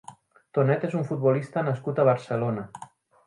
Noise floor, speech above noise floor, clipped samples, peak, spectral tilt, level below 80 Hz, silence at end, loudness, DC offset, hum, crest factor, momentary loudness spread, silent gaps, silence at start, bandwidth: -50 dBFS; 25 dB; under 0.1%; -8 dBFS; -8.5 dB/octave; -68 dBFS; 0.4 s; -26 LUFS; under 0.1%; none; 18 dB; 10 LU; none; 0.1 s; 11 kHz